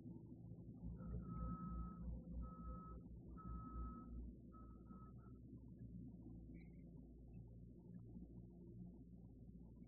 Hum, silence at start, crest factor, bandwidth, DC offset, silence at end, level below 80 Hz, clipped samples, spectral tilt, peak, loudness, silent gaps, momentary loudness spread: none; 0 s; 18 dB; 1.8 kHz; under 0.1%; 0 s; -58 dBFS; under 0.1%; -7.5 dB/octave; -36 dBFS; -56 LUFS; none; 10 LU